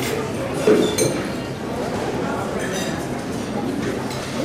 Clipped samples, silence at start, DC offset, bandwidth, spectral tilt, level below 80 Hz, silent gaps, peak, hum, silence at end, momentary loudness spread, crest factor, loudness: under 0.1%; 0 s; under 0.1%; 16 kHz; -4.5 dB/octave; -46 dBFS; none; -4 dBFS; none; 0 s; 9 LU; 18 dB; -23 LUFS